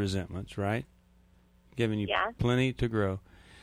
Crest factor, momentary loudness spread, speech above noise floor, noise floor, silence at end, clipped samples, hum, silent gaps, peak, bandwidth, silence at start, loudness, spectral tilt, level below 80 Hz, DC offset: 18 dB; 12 LU; 32 dB; -62 dBFS; 0.05 s; under 0.1%; none; none; -14 dBFS; 13.5 kHz; 0 s; -31 LUFS; -6.5 dB/octave; -50 dBFS; under 0.1%